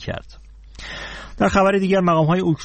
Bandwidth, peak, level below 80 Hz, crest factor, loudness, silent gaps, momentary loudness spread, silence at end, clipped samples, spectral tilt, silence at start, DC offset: 8.8 kHz; -4 dBFS; -40 dBFS; 16 dB; -17 LUFS; none; 17 LU; 0 s; under 0.1%; -6.5 dB/octave; 0 s; under 0.1%